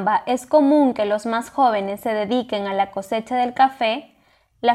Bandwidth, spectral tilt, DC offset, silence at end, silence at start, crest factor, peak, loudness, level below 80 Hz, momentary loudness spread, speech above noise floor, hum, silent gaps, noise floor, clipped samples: 14 kHz; -5 dB/octave; under 0.1%; 0 s; 0 s; 16 dB; -4 dBFS; -20 LUFS; -64 dBFS; 8 LU; 39 dB; none; none; -58 dBFS; under 0.1%